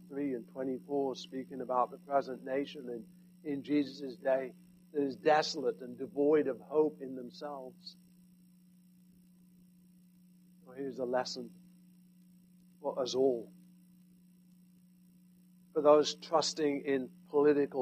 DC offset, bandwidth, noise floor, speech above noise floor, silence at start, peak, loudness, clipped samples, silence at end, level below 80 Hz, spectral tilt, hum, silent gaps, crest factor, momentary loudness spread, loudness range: under 0.1%; 14.5 kHz; -62 dBFS; 29 dB; 0 s; -14 dBFS; -34 LUFS; under 0.1%; 0 s; -82 dBFS; -4.5 dB/octave; none; none; 22 dB; 16 LU; 10 LU